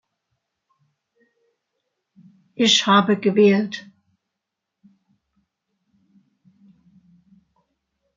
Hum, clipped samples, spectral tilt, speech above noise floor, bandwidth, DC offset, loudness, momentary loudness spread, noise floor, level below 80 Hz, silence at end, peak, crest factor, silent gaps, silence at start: none; under 0.1%; -4 dB/octave; 66 dB; 9 kHz; under 0.1%; -17 LUFS; 18 LU; -82 dBFS; -72 dBFS; 4.35 s; -2 dBFS; 22 dB; none; 2.6 s